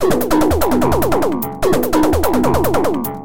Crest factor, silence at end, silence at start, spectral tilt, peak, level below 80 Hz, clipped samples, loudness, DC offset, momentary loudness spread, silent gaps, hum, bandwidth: 12 dB; 0 s; 0 s; -6 dB/octave; -2 dBFS; -28 dBFS; under 0.1%; -16 LUFS; 7%; 3 LU; none; none; 17.5 kHz